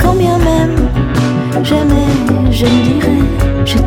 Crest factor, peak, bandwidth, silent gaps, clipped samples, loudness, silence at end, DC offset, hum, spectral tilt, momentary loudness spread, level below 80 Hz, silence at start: 10 dB; 0 dBFS; 17.5 kHz; none; under 0.1%; -12 LUFS; 0 s; under 0.1%; none; -6.5 dB/octave; 3 LU; -18 dBFS; 0 s